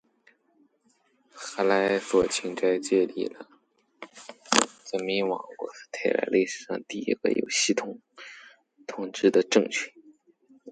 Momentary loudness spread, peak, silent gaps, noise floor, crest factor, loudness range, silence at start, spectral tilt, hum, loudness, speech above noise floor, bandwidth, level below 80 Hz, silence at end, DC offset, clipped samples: 21 LU; 0 dBFS; none; -68 dBFS; 28 dB; 2 LU; 1.35 s; -3 dB/octave; none; -26 LUFS; 42 dB; 10 kHz; -68 dBFS; 0 s; under 0.1%; under 0.1%